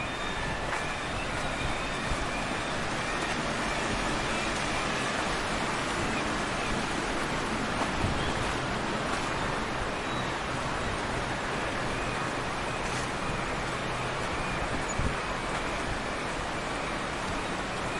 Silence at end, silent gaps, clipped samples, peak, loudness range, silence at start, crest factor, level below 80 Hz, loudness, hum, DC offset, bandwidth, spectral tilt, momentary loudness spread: 0 s; none; under 0.1%; -14 dBFS; 2 LU; 0 s; 18 dB; -42 dBFS; -31 LUFS; none; under 0.1%; 11.5 kHz; -4 dB/octave; 3 LU